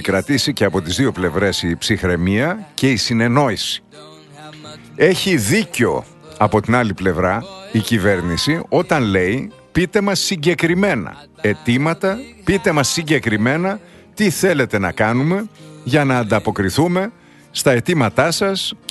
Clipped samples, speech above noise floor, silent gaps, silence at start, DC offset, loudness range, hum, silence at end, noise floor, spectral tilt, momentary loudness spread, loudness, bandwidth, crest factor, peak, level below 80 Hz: under 0.1%; 21 dB; none; 0 s; under 0.1%; 1 LU; none; 0.15 s; -38 dBFS; -5 dB/octave; 8 LU; -17 LUFS; 12.5 kHz; 16 dB; 0 dBFS; -44 dBFS